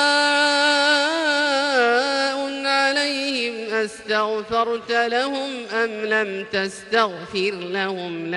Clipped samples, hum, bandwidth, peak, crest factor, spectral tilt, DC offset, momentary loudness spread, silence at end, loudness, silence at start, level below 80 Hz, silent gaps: under 0.1%; none; 11.5 kHz; -6 dBFS; 16 dB; -2.5 dB/octave; under 0.1%; 8 LU; 0 s; -20 LUFS; 0 s; -64 dBFS; none